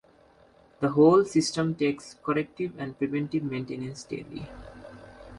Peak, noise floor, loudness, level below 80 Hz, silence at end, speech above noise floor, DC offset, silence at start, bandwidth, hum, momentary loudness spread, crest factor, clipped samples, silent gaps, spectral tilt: -8 dBFS; -58 dBFS; -27 LUFS; -58 dBFS; 0 s; 32 dB; under 0.1%; 0.8 s; 11.5 kHz; none; 25 LU; 18 dB; under 0.1%; none; -6 dB/octave